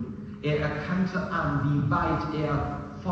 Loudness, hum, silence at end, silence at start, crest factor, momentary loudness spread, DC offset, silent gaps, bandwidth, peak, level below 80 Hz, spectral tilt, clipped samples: -28 LUFS; none; 0 s; 0 s; 14 dB; 8 LU; under 0.1%; none; 7.2 kHz; -14 dBFS; -44 dBFS; -8 dB/octave; under 0.1%